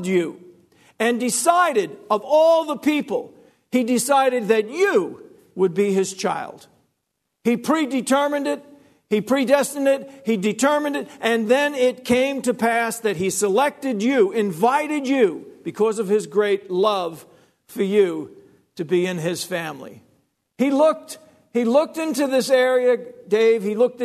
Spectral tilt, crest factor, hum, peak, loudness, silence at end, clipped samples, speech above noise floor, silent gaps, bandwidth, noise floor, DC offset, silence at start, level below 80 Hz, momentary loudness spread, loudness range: -4.5 dB/octave; 18 dB; none; -2 dBFS; -20 LUFS; 0 s; under 0.1%; 57 dB; none; 13.5 kHz; -76 dBFS; under 0.1%; 0 s; -66 dBFS; 10 LU; 4 LU